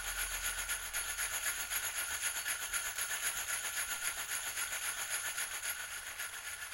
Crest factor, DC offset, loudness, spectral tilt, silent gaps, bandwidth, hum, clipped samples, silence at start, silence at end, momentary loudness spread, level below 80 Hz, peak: 20 dB; under 0.1%; -36 LUFS; 2 dB/octave; none; 16 kHz; none; under 0.1%; 0 s; 0 s; 5 LU; -60 dBFS; -20 dBFS